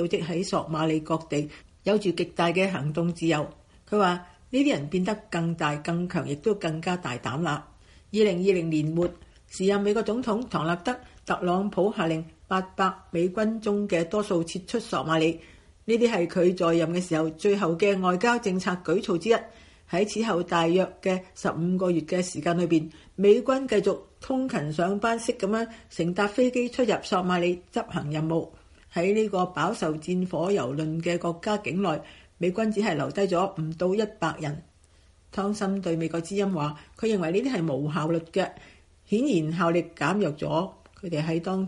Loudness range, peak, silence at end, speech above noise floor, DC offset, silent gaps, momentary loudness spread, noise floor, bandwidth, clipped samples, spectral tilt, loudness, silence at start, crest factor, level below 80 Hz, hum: 3 LU; -8 dBFS; 0 s; 32 dB; under 0.1%; none; 7 LU; -58 dBFS; 11.5 kHz; under 0.1%; -6 dB/octave; -26 LUFS; 0 s; 18 dB; -58 dBFS; none